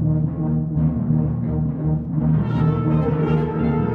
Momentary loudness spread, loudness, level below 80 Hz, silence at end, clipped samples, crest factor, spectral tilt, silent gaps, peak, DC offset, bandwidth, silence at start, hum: 3 LU; -21 LUFS; -34 dBFS; 0 s; under 0.1%; 12 dB; -11.5 dB/octave; none; -8 dBFS; under 0.1%; 3.9 kHz; 0 s; none